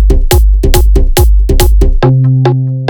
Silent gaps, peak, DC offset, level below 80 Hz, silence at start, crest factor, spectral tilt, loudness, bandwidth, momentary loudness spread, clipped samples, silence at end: none; 0 dBFS; under 0.1%; -8 dBFS; 0 s; 6 dB; -6 dB/octave; -9 LUFS; 19.5 kHz; 1 LU; 0.1%; 0 s